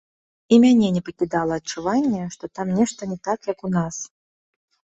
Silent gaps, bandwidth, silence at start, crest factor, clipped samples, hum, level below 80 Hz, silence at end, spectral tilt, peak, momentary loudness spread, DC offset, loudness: none; 8 kHz; 0.5 s; 18 dB; under 0.1%; none; -58 dBFS; 0.9 s; -6 dB/octave; -4 dBFS; 14 LU; under 0.1%; -21 LUFS